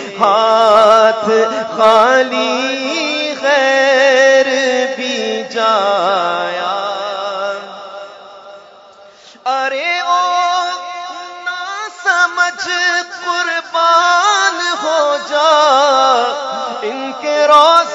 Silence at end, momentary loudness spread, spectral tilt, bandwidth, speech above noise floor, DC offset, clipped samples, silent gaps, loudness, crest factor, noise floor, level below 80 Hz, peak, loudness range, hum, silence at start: 0 s; 13 LU; -1.5 dB/octave; 11.5 kHz; 29 dB; under 0.1%; 0.2%; none; -13 LUFS; 14 dB; -41 dBFS; -66 dBFS; 0 dBFS; 8 LU; none; 0 s